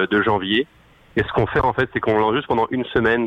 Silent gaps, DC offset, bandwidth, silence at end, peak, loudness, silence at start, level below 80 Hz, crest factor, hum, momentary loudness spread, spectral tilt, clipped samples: none; under 0.1%; 7.4 kHz; 0 s; -8 dBFS; -20 LUFS; 0 s; -42 dBFS; 12 dB; none; 4 LU; -7.5 dB/octave; under 0.1%